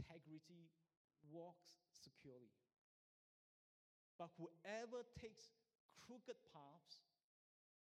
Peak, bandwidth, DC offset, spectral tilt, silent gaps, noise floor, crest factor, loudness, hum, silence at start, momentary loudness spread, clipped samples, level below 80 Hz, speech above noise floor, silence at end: -40 dBFS; 12.5 kHz; under 0.1%; -5 dB/octave; 0.97-1.08 s, 2.78-4.19 s, 5.80-5.89 s; under -90 dBFS; 22 dB; -60 LUFS; none; 0 s; 15 LU; under 0.1%; -84 dBFS; over 31 dB; 0.85 s